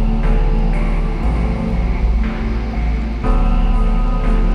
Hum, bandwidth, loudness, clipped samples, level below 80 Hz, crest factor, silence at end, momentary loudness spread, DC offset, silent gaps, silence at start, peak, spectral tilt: none; 5.4 kHz; -19 LUFS; under 0.1%; -16 dBFS; 10 dB; 0 s; 3 LU; under 0.1%; none; 0 s; -4 dBFS; -8.5 dB/octave